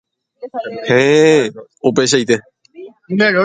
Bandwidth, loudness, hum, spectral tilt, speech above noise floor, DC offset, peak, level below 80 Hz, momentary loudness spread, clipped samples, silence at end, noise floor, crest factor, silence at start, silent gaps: 9.6 kHz; -14 LUFS; none; -4.5 dB/octave; 24 dB; under 0.1%; 0 dBFS; -58 dBFS; 16 LU; under 0.1%; 0 s; -37 dBFS; 14 dB; 0.4 s; none